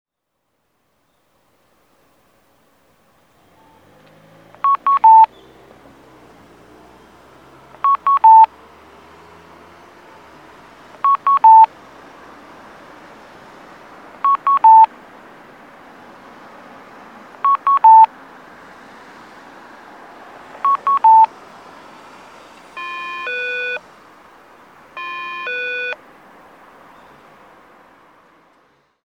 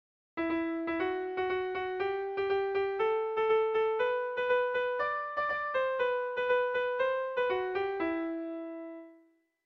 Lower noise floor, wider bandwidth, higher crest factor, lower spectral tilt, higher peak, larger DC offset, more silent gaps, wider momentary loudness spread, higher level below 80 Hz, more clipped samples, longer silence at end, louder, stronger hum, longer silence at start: first, -73 dBFS vs -65 dBFS; about the same, 6 kHz vs 6 kHz; about the same, 18 dB vs 14 dB; second, -3 dB/octave vs -6 dB/octave; first, -2 dBFS vs -18 dBFS; neither; neither; first, 19 LU vs 8 LU; about the same, -66 dBFS vs -68 dBFS; neither; first, 3.1 s vs 0.5 s; first, -13 LUFS vs -32 LUFS; neither; first, 4.65 s vs 0.35 s